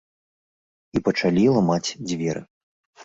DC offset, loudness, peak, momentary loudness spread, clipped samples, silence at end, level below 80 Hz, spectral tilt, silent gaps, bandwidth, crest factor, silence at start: under 0.1%; -22 LUFS; -6 dBFS; 10 LU; under 0.1%; 0 s; -54 dBFS; -6 dB/octave; 2.50-2.93 s; 8 kHz; 18 dB; 0.95 s